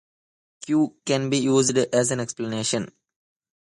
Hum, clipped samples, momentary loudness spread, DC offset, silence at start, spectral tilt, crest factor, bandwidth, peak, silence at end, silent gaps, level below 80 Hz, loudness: none; under 0.1%; 9 LU; under 0.1%; 0.6 s; -4.5 dB/octave; 18 dB; 11.5 kHz; -6 dBFS; 0.95 s; none; -64 dBFS; -23 LUFS